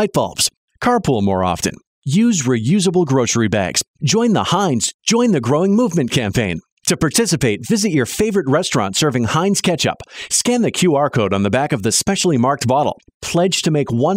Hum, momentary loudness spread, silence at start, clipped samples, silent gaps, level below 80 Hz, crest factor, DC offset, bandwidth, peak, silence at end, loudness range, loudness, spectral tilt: none; 4 LU; 0 s; under 0.1%; 0.57-0.68 s, 1.87-2.02 s, 3.88-3.94 s, 4.94-4.99 s, 6.72-6.77 s, 13.14-13.20 s; -46 dBFS; 14 dB; under 0.1%; 16 kHz; -2 dBFS; 0 s; 1 LU; -16 LUFS; -4.5 dB/octave